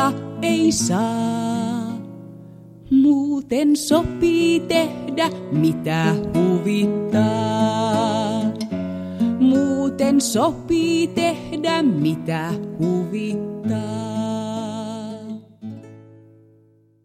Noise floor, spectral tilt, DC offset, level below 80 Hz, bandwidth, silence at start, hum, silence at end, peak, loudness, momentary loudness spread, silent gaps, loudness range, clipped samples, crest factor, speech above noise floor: -55 dBFS; -5.5 dB/octave; under 0.1%; -50 dBFS; 15.5 kHz; 0 s; none; 1.05 s; -4 dBFS; -20 LUFS; 12 LU; none; 7 LU; under 0.1%; 16 dB; 36 dB